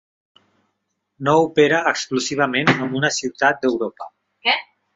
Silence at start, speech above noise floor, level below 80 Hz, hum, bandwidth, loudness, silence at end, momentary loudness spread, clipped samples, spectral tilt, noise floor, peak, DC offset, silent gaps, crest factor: 1.2 s; 55 dB; -62 dBFS; none; 8 kHz; -19 LUFS; 0.35 s; 10 LU; under 0.1%; -4 dB/octave; -74 dBFS; -2 dBFS; under 0.1%; none; 20 dB